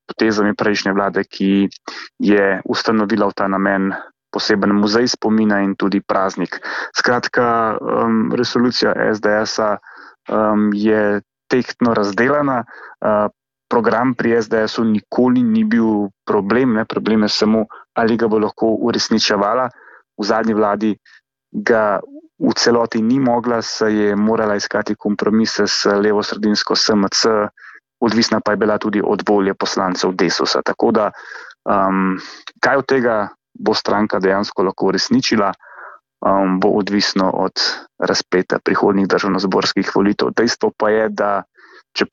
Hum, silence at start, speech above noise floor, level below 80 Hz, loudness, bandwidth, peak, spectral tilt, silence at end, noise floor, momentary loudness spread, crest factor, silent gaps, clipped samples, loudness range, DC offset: none; 0.1 s; 23 dB; -54 dBFS; -17 LUFS; 7.6 kHz; -2 dBFS; -4.5 dB/octave; 0.05 s; -39 dBFS; 7 LU; 14 dB; none; under 0.1%; 2 LU; under 0.1%